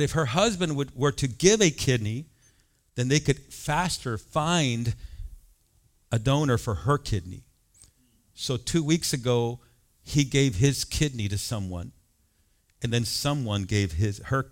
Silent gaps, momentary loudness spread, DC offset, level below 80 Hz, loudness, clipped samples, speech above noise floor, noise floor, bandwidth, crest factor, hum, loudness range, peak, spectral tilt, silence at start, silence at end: none; 13 LU; under 0.1%; -46 dBFS; -26 LUFS; under 0.1%; 41 dB; -66 dBFS; 16.5 kHz; 22 dB; none; 4 LU; -4 dBFS; -4.5 dB/octave; 0 s; 0 s